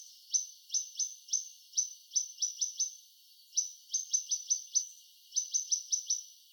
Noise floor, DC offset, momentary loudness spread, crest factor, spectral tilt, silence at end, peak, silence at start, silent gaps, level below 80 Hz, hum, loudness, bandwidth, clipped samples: -60 dBFS; under 0.1%; 5 LU; 20 dB; 11 dB/octave; 0.15 s; -18 dBFS; 0 s; none; under -90 dBFS; none; -33 LUFS; over 20 kHz; under 0.1%